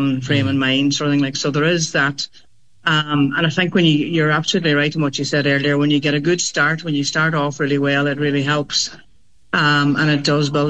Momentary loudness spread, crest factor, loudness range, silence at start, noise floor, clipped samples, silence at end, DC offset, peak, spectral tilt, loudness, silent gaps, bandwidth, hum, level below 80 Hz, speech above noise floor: 4 LU; 14 dB; 2 LU; 0 s; -57 dBFS; under 0.1%; 0 s; 0.5%; -4 dBFS; -4.5 dB/octave; -17 LUFS; none; 8.6 kHz; none; -58 dBFS; 40 dB